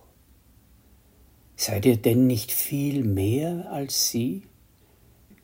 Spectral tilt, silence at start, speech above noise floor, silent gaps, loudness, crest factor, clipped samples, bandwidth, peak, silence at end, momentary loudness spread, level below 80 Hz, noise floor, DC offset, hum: -5 dB/octave; 1.6 s; 34 dB; none; -24 LUFS; 20 dB; under 0.1%; 16.5 kHz; -6 dBFS; 1 s; 9 LU; -60 dBFS; -58 dBFS; under 0.1%; none